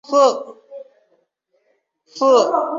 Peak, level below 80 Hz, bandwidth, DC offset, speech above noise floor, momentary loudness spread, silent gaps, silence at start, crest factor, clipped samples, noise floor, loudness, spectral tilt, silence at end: -2 dBFS; -76 dBFS; 7.6 kHz; under 0.1%; 51 dB; 25 LU; none; 0.1 s; 16 dB; under 0.1%; -66 dBFS; -16 LUFS; -3 dB/octave; 0 s